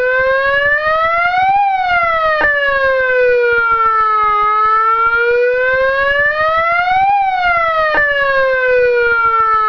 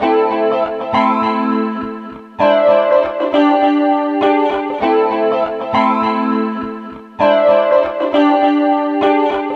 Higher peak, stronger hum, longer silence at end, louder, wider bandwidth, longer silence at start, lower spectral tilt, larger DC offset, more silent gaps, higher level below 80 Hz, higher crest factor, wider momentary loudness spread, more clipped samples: about the same, -2 dBFS vs -2 dBFS; neither; about the same, 0 s vs 0 s; about the same, -12 LUFS vs -14 LUFS; second, 5.4 kHz vs 6.4 kHz; about the same, 0 s vs 0 s; second, -4 dB/octave vs -7 dB/octave; neither; neither; first, -40 dBFS vs -56 dBFS; about the same, 12 dB vs 12 dB; second, 2 LU vs 9 LU; neither